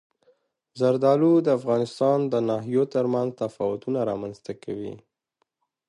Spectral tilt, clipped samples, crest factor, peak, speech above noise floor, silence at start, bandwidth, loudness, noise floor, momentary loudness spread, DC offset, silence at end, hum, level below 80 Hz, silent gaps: -8 dB/octave; under 0.1%; 18 dB; -8 dBFS; 52 dB; 0.75 s; 11 kHz; -24 LUFS; -76 dBFS; 14 LU; under 0.1%; 0.9 s; none; -68 dBFS; none